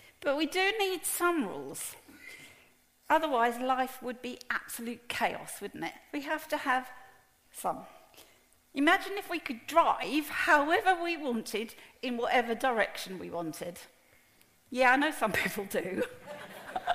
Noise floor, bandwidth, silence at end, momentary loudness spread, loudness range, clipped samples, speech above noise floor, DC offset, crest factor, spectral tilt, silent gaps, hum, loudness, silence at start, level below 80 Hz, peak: -64 dBFS; 15.5 kHz; 0 s; 15 LU; 6 LU; under 0.1%; 33 dB; under 0.1%; 22 dB; -3 dB/octave; none; none; -31 LUFS; 0.2 s; -66 dBFS; -10 dBFS